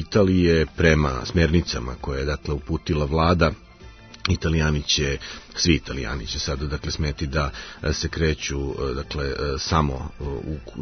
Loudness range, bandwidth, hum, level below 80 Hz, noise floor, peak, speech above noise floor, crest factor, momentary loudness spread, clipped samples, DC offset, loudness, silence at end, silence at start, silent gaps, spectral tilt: 4 LU; 6.6 kHz; none; -34 dBFS; -44 dBFS; -4 dBFS; 21 dB; 20 dB; 11 LU; under 0.1%; under 0.1%; -23 LUFS; 0 s; 0 s; none; -5 dB/octave